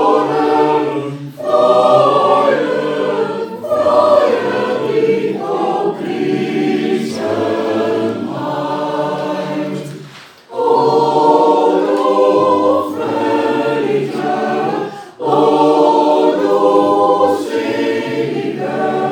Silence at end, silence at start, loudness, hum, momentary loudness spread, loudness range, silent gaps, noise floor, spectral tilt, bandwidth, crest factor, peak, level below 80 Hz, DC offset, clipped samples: 0 s; 0 s; -14 LUFS; none; 9 LU; 5 LU; none; -37 dBFS; -6 dB/octave; 17.5 kHz; 14 dB; 0 dBFS; -68 dBFS; under 0.1%; under 0.1%